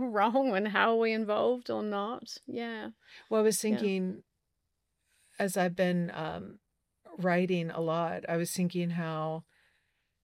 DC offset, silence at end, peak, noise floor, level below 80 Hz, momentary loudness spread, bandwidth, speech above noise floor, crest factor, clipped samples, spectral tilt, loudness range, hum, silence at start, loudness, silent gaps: under 0.1%; 0.8 s; -10 dBFS; -82 dBFS; -76 dBFS; 13 LU; 16 kHz; 51 dB; 22 dB; under 0.1%; -5.5 dB/octave; 3 LU; none; 0 s; -31 LUFS; none